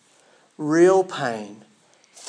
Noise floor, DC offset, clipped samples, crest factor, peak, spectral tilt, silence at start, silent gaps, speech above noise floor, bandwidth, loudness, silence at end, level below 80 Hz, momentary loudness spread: -57 dBFS; under 0.1%; under 0.1%; 18 dB; -6 dBFS; -5.5 dB/octave; 0.6 s; none; 37 dB; 10.5 kHz; -20 LUFS; 0.75 s; -86 dBFS; 17 LU